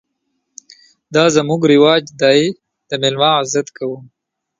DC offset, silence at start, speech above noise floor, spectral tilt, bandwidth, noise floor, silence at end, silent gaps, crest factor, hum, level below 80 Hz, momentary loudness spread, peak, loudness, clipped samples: under 0.1%; 1.1 s; 57 dB; -4.5 dB/octave; 9.6 kHz; -71 dBFS; 0.55 s; none; 16 dB; none; -60 dBFS; 14 LU; 0 dBFS; -14 LUFS; under 0.1%